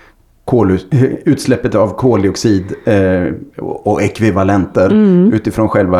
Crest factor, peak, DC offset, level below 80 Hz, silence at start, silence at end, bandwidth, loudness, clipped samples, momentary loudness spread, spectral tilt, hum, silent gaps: 12 dB; 0 dBFS; under 0.1%; -40 dBFS; 0.45 s; 0 s; 14 kHz; -12 LUFS; under 0.1%; 7 LU; -7.5 dB/octave; none; none